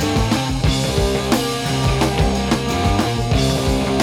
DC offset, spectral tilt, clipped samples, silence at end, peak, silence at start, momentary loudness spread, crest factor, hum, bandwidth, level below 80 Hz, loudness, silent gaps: under 0.1%; -5 dB/octave; under 0.1%; 0 s; -4 dBFS; 0 s; 2 LU; 14 dB; none; 18 kHz; -26 dBFS; -18 LUFS; none